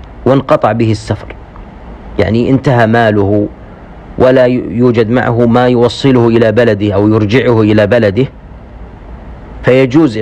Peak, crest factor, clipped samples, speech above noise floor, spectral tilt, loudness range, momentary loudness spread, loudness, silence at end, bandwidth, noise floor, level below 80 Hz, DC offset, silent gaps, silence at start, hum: 0 dBFS; 10 dB; 0.9%; 22 dB; -8 dB/octave; 3 LU; 12 LU; -10 LUFS; 0 s; 9.2 kHz; -30 dBFS; -34 dBFS; under 0.1%; none; 0 s; none